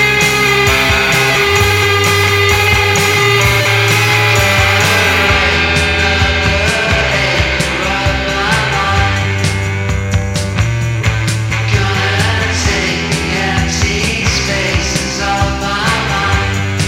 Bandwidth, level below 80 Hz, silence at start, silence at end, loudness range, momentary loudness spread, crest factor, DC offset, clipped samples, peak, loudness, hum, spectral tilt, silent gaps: 17 kHz; -24 dBFS; 0 s; 0 s; 5 LU; 6 LU; 12 dB; under 0.1%; under 0.1%; 0 dBFS; -11 LUFS; none; -3.5 dB/octave; none